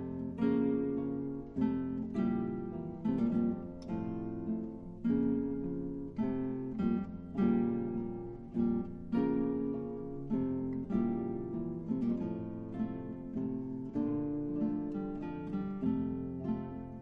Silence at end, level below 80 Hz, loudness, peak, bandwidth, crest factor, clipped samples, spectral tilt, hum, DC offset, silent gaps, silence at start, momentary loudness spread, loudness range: 0 s; -56 dBFS; -36 LUFS; -20 dBFS; 5.2 kHz; 16 dB; under 0.1%; -10.5 dB/octave; none; under 0.1%; none; 0 s; 8 LU; 3 LU